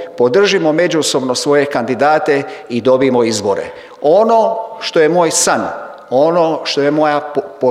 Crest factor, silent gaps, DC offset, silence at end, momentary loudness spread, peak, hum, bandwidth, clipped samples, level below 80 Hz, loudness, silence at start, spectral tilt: 12 dB; none; under 0.1%; 0 s; 7 LU; 0 dBFS; none; 15 kHz; under 0.1%; -60 dBFS; -13 LUFS; 0 s; -3.5 dB/octave